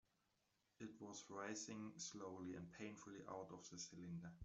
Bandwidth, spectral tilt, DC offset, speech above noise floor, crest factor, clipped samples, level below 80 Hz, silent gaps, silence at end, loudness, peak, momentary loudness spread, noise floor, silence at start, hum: 8.2 kHz; -4 dB/octave; under 0.1%; 32 dB; 18 dB; under 0.1%; -84 dBFS; none; 0 s; -54 LUFS; -38 dBFS; 6 LU; -86 dBFS; 0.8 s; none